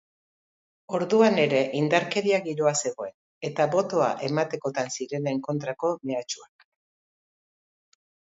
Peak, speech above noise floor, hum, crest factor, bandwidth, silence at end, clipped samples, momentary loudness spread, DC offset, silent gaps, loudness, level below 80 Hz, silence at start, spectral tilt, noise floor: -6 dBFS; over 65 dB; none; 22 dB; 8 kHz; 1.85 s; under 0.1%; 12 LU; under 0.1%; 3.14-3.41 s; -25 LUFS; -76 dBFS; 0.9 s; -4.5 dB/octave; under -90 dBFS